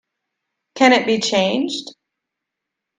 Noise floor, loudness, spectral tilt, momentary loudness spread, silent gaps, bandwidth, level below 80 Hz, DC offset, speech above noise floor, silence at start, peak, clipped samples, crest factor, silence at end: -82 dBFS; -17 LUFS; -3.5 dB/octave; 11 LU; none; 9.6 kHz; -64 dBFS; under 0.1%; 65 dB; 0.75 s; 0 dBFS; under 0.1%; 20 dB; 1.1 s